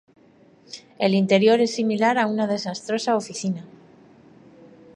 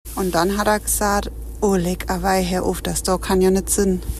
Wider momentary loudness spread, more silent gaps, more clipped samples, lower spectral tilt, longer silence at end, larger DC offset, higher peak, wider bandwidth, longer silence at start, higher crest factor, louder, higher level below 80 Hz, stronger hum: first, 16 LU vs 5 LU; neither; neither; about the same, -5 dB/octave vs -4.5 dB/octave; first, 1.3 s vs 0 s; neither; about the same, -4 dBFS vs -6 dBFS; second, 11.5 kHz vs 14.5 kHz; first, 0.7 s vs 0.05 s; first, 20 dB vs 14 dB; about the same, -21 LUFS vs -20 LUFS; second, -72 dBFS vs -32 dBFS; neither